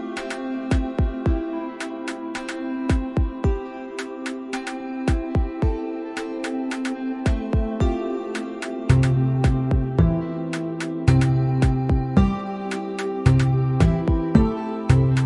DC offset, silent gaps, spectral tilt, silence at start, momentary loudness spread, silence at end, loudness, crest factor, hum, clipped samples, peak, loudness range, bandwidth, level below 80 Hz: under 0.1%; none; -7.5 dB/octave; 0 s; 11 LU; 0 s; -23 LUFS; 20 dB; none; under 0.1%; -2 dBFS; 6 LU; 11 kHz; -30 dBFS